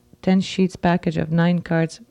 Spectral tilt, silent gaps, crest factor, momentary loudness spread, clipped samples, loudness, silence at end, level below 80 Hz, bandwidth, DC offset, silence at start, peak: -7 dB/octave; none; 14 dB; 3 LU; under 0.1%; -21 LUFS; 0.15 s; -50 dBFS; 10 kHz; under 0.1%; 0.25 s; -8 dBFS